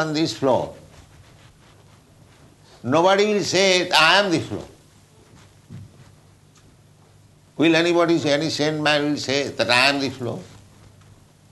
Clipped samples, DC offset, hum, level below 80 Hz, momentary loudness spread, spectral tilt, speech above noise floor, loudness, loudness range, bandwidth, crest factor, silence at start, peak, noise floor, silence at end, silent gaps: under 0.1%; under 0.1%; none; -60 dBFS; 16 LU; -4 dB/octave; 33 dB; -19 LUFS; 6 LU; 12 kHz; 18 dB; 0 s; -4 dBFS; -52 dBFS; 1.05 s; none